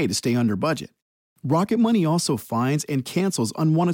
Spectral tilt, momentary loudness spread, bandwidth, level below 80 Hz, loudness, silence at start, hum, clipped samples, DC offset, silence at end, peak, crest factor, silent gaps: -5.5 dB/octave; 6 LU; 17 kHz; -64 dBFS; -22 LUFS; 0 s; none; under 0.1%; under 0.1%; 0 s; -10 dBFS; 12 dB; 1.02-1.36 s